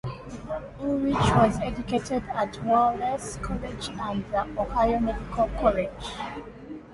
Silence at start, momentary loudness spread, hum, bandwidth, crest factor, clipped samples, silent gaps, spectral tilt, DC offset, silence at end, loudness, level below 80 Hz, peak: 0.05 s; 13 LU; none; 11.5 kHz; 20 dB; under 0.1%; none; -6 dB/octave; under 0.1%; 0 s; -27 LUFS; -40 dBFS; -6 dBFS